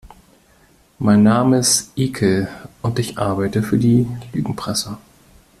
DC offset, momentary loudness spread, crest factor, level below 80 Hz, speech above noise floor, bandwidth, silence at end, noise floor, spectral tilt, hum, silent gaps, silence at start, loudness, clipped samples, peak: under 0.1%; 11 LU; 16 dB; -48 dBFS; 36 dB; 15 kHz; 0.6 s; -53 dBFS; -5 dB/octave; none; none; 1 s; -18 LUFS; under 0.1%; -2 dBFS